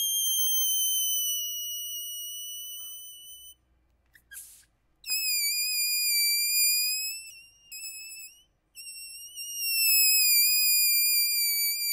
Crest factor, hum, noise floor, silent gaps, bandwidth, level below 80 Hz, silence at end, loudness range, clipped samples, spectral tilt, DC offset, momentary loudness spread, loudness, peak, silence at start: 18 dB; none; -68 dBFS; none; 16 kHz; -74 dBFS; 0 s; 13 LU; under 0.1%; 6.5 dB/octave; under 0.1%; 23 LU; -23 LUFS; -12 dBFS; 0 s